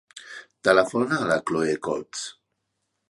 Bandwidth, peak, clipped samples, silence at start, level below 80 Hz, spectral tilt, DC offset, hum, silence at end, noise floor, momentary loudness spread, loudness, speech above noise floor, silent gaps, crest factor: 11.5 kHz; -2 dBFS; under 0.1%; 0.15 s; -64 dBFS; -4.5 dB/octave; under 0.1%; none; 0.8 s; -78 dBFS; 20 LU; -24 LUFS; 54 dB; none; 22 dB